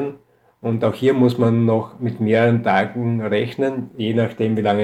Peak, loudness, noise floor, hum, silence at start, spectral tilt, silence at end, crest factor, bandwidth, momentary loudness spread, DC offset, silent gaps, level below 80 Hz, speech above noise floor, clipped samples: -4 dBFS; -19 LUFS; -49 dBFS; none; 0 s; -8.5 dB/octave; 0 s; 14 dB; 9 kHz; 9 LU; under 0.1%; none; -64 dBFS; 31 dB; under 0.1%